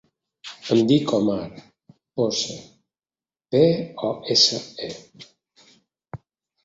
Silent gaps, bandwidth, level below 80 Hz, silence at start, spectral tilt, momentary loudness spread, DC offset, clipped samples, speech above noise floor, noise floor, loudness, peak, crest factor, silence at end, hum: none; 8 kHz; -62 dBFS; 0.45 s; -4.5 dB/octave; 24 LU; under 0.1%; under 0.1%; over 68 dB; under -90 dBFS; -21 LUFS; -4 dBFS; 20 dB; 0.5 s; none